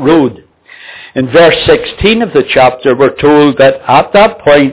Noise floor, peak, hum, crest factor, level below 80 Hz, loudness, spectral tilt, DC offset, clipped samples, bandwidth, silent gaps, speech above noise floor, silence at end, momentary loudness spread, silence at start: -33 dBFS; 0 dBFS; none; 8 dB; -34 dBFS; -7 LUFS; -9.5 dB/octave; 0.6%; 2%; 4 kHz; none; 26 dB; 0 s; 5 LU; 0 s